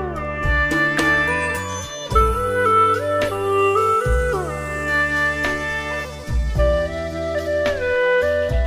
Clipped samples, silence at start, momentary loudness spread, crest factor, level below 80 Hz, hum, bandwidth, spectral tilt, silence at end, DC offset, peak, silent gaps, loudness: under 0.1%; 0 s; 9 LU; 16 dB; -28 dBFS; none; 15.5 kHz; -5 dB/octave; 0 s; under 0.1%; -2 dBFS; none; -19 LUFS